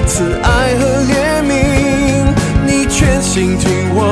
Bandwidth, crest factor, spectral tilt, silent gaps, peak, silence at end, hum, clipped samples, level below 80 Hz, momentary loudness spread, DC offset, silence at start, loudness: 11 kHz; 12 dB; -5 dB/octave; none; 0 dBFS; 0 s; none; under 0.1%; -20 dBFS; 2 LU; under 0.1%; 0 s; -12 LUFS